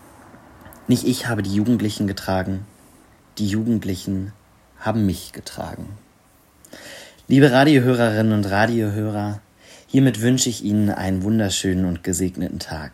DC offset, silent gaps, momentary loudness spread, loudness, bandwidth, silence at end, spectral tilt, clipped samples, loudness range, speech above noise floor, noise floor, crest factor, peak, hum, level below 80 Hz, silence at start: under 0.1%; none; 19 LU; -20 LUFS; 16 kHz; 0.05 s; -5.5 dB/octave; under 0.1%; 7 LU; 35 dB; -55 dBFS; 20 dB; -2 dBFS; none; -52 dBFS; 0.65 s